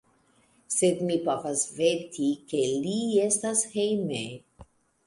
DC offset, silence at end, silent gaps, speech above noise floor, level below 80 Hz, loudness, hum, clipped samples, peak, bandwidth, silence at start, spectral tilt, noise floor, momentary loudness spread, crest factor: under 0.1%; 0.45 s; none; 38 dB; -66 dBFS; -27 LUFS; none; under 0.1%; -10 dBFS; 11.5 kHz; 0.7 s; -4 dB/octave; -65 dBFS; 6 LU; 18 dB